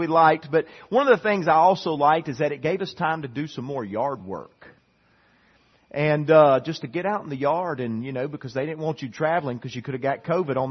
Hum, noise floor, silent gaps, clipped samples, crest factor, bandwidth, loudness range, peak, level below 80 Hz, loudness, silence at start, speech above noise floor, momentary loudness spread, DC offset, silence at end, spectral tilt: none; -62 dBFS; none; under 0.1%; 20 dB; 6.4 kHz; 8 LU; -4 dBFS; -66 dBFS; -23 LUFS; 0 s; 39 dB; 13 LU; under 0.1%; 0 s; -7 dB/octave